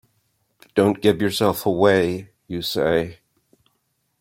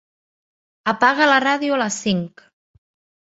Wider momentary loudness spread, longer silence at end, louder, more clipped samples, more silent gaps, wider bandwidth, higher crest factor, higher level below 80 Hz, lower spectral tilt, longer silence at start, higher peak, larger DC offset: first, 13 LU vs 10 LU; about the same, 1.05 s vs 0.95 s; about the same, -20 LUFS vs -18 LUFS; neither; neither; first, 16.5 kHz vs 8 kHz; about the same, 20 dB vs 20 dB; first, -54 dBFS vs -62 dBFS; first, -5.5 dB/octave vs -3.5 dB/octave; about the same, 0.75 s vs 0.85 s; about the same, -2 dBFS vs -2 dBFS; neither